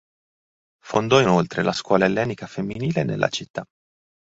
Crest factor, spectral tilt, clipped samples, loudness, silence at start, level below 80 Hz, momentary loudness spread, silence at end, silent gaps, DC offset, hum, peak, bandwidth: 20 dB; -5.5 dB/octave; under 0.1%; -21 LUFS; 0.85 s; -56 dBFS; 12 LU; 0.65 s; 3.50-3.54 s; under 0.1%; none; -2 dBFS; 8 kHz